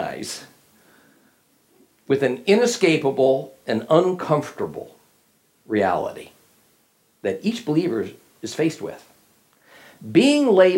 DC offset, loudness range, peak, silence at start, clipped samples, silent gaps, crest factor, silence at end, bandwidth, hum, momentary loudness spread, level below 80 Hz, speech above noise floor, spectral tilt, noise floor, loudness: under 0.1%; 7 LU; -2 dBFS; 0 s; under 0.1%; none; 20 dB; 0 s; 16.5 kHz; none; 17 LU; -70 dBFS; 42 dB; -5 dB/octave; -62 dBFS; -21 LUFS